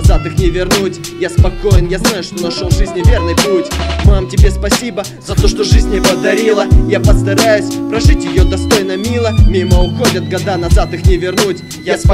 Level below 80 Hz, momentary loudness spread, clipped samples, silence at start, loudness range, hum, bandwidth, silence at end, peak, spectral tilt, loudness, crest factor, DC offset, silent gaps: -14 dBFS; 6 LU; 0.4%; 0 s; 2 LU; none; 16 kHz; 0 s; 0 dBFS; -5.5 dB/octave; -12 LUFS; 10 dB; under 0.1%; none